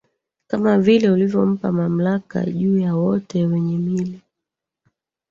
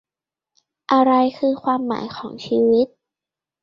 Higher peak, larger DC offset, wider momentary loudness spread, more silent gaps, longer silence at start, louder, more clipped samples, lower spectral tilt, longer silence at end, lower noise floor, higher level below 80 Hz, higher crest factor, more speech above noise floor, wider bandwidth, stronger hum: about the same, -4 dBFS vs -2 dBFS; neither; second, 9 LU vs 14 LU; neither; second, 0.5 s vs 0.9 s; about the same, -19 LUFS vs -19 LUFS; neither; first, -8.5 dB/octave vs -6.5 dB/octave; first, 1.15 s vs 0.75 s; second, -84 dBFS vs -89 dBFS; first, -58 dBFS vs -64 dBFS; about the same, 16 dB vs 18 dB; second, 66 dB vs 71 dB; about the same, 7.2 kHz vs 7 kHz; neither